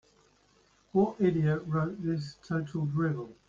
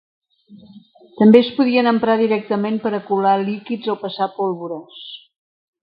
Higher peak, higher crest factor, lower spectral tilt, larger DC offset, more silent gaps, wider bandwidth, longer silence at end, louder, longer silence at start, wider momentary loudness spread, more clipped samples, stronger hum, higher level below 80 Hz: second, -14 dBFS vs 0 dBFS; about the same, 16 dB vs 18 dB; about the same, -9 dB/octave vs -9 dB/octave; neither; neither; first, 7.4 kHz vs 5.2 kHz; second, 0.15 s vs 0.65 s; second, -31 LUFS vs -17 LUFS; first, 0.95 s vs 0.5 s; second, 8 LU vs 19 LU; neither; neither; about the same, -62 dBFS vs -66 dBFS